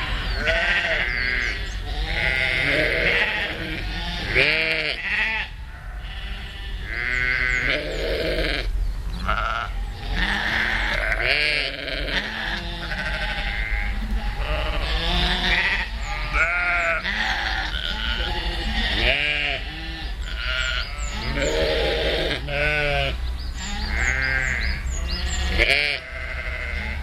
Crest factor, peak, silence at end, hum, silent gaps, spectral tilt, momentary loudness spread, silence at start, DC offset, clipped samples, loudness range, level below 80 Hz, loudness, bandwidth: 22 dB; -2 dBFS; 0 s; none; none; -3.5 dB/octave; 11 LU; 0 s; under 0.1%; under 0.1%; 3 LU; -28 dBFS; -23 LUFS; 14 kHz